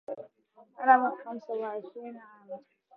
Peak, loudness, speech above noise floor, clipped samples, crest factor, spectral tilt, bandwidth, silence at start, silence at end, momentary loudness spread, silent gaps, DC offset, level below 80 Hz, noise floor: -8 dBFS; -28 LUFS; 32 dB; under 0.1%; 24 dB; -3 dB/octave; 4.1 kHz; 0.1 s; 0.35 s; 23 LU; none; under 0.1%; under -90 dBFS; -61 dBFS